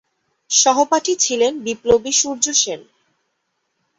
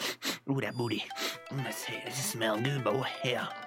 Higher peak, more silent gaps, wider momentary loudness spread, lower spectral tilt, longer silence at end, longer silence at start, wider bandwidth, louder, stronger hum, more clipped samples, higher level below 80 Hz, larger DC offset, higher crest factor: first, -2 dBFS vs -16 dBFS; neither; about the same, 7 LU vs 5 LU; second, -1 dB/octave vs -4 dB/octave; first, 1.2 s vs 0 s; first, 0.5 s vs 0 s; second, 8.2 kHz vs 17 kHz; first, -16 LUFS vs -33 LUFS; neither; neither; first, -52 dBFS vs -78 dBFS; neither; about the same, 18 dB vs 18 dB